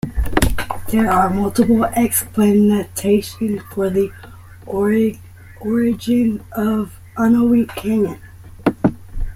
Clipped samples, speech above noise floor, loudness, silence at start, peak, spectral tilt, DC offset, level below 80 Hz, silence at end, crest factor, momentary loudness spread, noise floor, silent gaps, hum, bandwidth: under 0.1%; 21 dB; -18 LUFS; 0.05 s; 0 dBFS; -6 dB/octave; under 0.1%; -32 dBFS; 0 s; 18 dB; 9 LU; -37 dBFS; none; none; 16 kHz